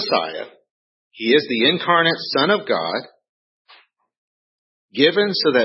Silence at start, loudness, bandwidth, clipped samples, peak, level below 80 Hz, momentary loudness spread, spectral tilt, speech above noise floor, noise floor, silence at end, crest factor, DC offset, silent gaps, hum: 0 s; -18 LUFS; 5.8 kHz; under 0.1%; -2 dBFS; -76 dBFS; 13 LU; -8 dB/octave; 34 dB; -53 dBFS; 0 s; 20 dB; under 0.1%; 0.70-1.10 s, 3.29-3.65 s, 4.17-4.89 s; none